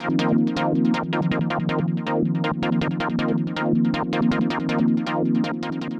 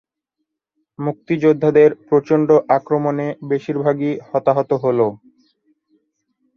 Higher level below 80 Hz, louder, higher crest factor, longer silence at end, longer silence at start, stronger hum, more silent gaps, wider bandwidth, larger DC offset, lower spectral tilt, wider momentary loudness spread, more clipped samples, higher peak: first, -52 dBFS vs -64 dBFS; second, -22 LUFS vs -17 LUFS; about the same, 14 dB vs 16 dB; second, 0 s vs 1.4 s; second, 0 s vs 1 s; neither; neither; first, 8 kHz vs 6.6 kHz; neither; second, -7.5 dB/octave vs -9 dB/octave; second, 3 LU vs 9 LU; neither; second, -8 dBFS vs -2 dBFS